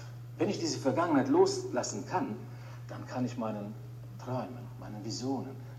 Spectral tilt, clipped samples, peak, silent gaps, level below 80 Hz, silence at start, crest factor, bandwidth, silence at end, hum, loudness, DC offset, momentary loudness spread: -5.5 dB/octave; under 0.1%; -12 dBFS; none; -66 dBFS; 0 s; 20 dB; 15 kHz; 0 s; none; -33 LUFS; under 0.1%; 17 LU